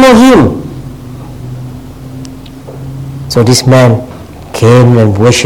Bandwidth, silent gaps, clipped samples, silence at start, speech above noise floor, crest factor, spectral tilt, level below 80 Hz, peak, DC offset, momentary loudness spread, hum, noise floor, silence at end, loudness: 16.5 kHz; none; 2%; 0 s; 21 dB; 8 dB; -6 dB/octave; -32 dBFS; 0 dBFS; under 0.1%; 22 LU; none; -26 dBFS; 0 s; -6 LUFS